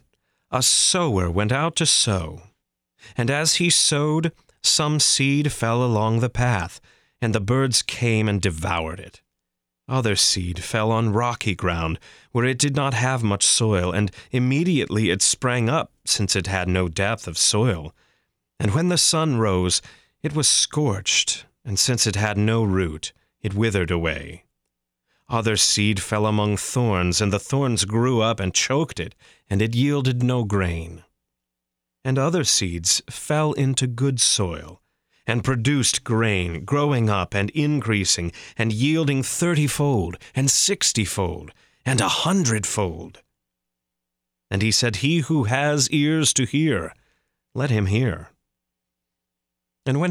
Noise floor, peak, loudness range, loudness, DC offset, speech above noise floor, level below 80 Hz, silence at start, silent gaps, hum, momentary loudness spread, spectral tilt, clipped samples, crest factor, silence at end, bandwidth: -83 dBFS; -6 dBFS; 4 LU; -21 LUFS; under 0.1%; 62 dB; -46 dBFS; 0.5 s; none; none; 11 LU; -3.5 dB/octave; under 0.1%; 18 dB; 0 s; 16 kHz